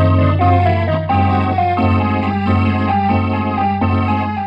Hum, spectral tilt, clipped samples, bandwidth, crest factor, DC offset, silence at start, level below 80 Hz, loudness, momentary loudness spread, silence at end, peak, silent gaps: none; -9.5 dB/octave; under 0.1%; 5.4 kHz; 14 dB; under 0.1%; 0 s; -46 dBFS; -15 LUFS; 4 LU; 0 s; -2 dBFS; none